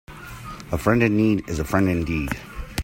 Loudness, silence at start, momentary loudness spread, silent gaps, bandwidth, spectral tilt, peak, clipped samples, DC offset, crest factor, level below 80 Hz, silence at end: -22 LUFS; 0.1 s; 18 LU; none; 16.5 kHz; -6.5 dB/octave; -4 dBFS; under 0.1%; under 0.1%; 20 dB; -38 dBFS; 0 s